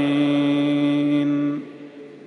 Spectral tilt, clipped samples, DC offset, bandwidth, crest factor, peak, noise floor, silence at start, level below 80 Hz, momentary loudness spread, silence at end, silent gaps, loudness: -7.5 dB/octave; under 0.1%; under 0.1%; 6.2 kHz; 12 dB; -10 dBFS; -40 dBFS; 0 s; -72 dBFS; 19 LU; 0.05 s; none; -20 LUFS